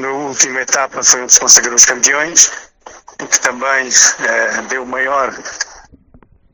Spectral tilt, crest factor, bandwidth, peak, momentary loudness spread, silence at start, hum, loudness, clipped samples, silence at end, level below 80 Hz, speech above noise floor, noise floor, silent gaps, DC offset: 1 dB/octave; 14 dB; over 20 kHz; 0 dBFS; 16 LU; 0 s; none; -10 LUFS; 0.9%; 0.75 s; -52 dBFS; 34 dB; -46 dBFS; none; under 0.1%